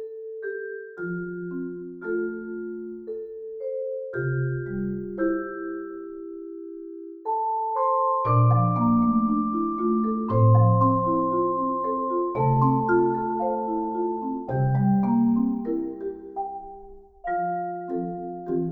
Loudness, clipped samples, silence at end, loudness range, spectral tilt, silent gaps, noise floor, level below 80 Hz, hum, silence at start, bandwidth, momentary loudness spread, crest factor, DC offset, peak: -25 LUFS; under 0.1%; 0 s; 9 LU; -13 dB/octave; none; -45 dBFS; -52 dBFS; none; 0 s; 2.5 kHz; 15 LU; 16 dB; under 0.1%; -8 dBFS